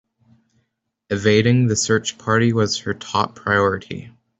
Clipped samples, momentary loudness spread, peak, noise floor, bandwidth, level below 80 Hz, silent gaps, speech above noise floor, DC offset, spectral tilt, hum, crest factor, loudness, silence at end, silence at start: under 0.1%; 11 LU; -4 dBFS; -72 dBFS; 8.2 kHz; -56 dBFS; none; 53 dB; under 0.1%; -5 dB/octave; none; 18 dB; -19 LUFS; 0.3 s; 1.1 s